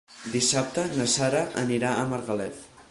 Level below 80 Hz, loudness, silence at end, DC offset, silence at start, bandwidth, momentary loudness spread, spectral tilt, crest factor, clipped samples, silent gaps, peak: -58 dBFS; -26 LUFS; 0.1 s; under 0.1%; 0.1 s; 11.5 kHz; 9 LU; -3.5 dB/octave; 16 dB; under 0.1%; none; -10 dBFS